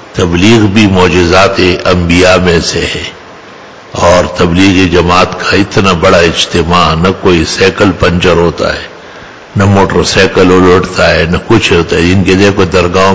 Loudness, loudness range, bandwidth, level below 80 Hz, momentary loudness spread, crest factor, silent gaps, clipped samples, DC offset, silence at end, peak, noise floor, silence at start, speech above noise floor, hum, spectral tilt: -7 LUFS; 2 LU; 8 kHz; -24 dBFS; 6 LU; 8 dB; none; 4%; 2%; 0 s; 0 dBFS; -30 dBFS; 0 s; 24 dB; none; -5 dB/octave